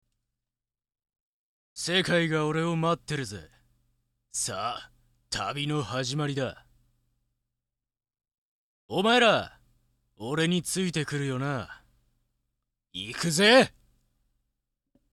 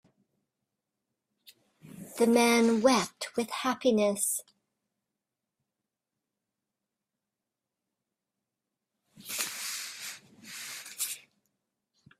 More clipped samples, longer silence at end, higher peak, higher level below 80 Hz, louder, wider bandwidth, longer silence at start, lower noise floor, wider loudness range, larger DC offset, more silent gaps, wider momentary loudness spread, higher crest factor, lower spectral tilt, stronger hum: neither; first, 1.45 s vs 1 s; about the same, -8 dBFS vs -10 dBFS; first, -62 dBFS vs -76 dBFS; about the same, -26 LUFS vs -28 LUFS; second, 14 kHz vs 16 kHz; about the same, 1.75 s vs 1.85 s; about the same, under -90 dBFS vs -89 dBFS; second, 7 LU vs 13 LU; neither; first, 8.38-8.89 s vs none; about the same, 17 LU vs 19 LU; about the same, 22 dB vs 22 dB; about the same, -4 dB/octave vs -3 dB/octave; neither